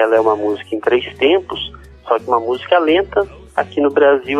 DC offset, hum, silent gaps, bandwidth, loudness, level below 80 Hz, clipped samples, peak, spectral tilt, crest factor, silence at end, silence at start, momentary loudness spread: under 0.1%; none; none; 10 kHz; -16 LUFS; -46 dBFS; under 0.1%; 0 dBFS; -6 dB/octave; 14 dB; 0 s; 0 s; 9 LU